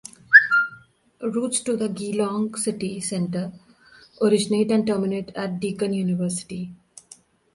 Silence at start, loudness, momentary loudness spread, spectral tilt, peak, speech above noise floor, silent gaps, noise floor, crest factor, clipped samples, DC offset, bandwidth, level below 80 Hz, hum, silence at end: 0.3 s; -22 LUFS; 16 LU; -4.5 dB/octave; 0 dBFS; 28 dB; none; -52 dBFS; 24 dB; under 0.1%; under 0.1%; 11.5 kHz; -62 dBFS; none; 0.8 s